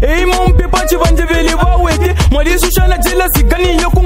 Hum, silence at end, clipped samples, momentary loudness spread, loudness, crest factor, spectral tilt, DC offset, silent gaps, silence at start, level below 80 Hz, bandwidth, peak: none; 0 s; under 0.1%; 1 LU; -11 LUFS; 10 dB; -5 dB/octave; under 0.1%; none; 0 s; -12 dBFS; 16.5 kHz; 0 dBFS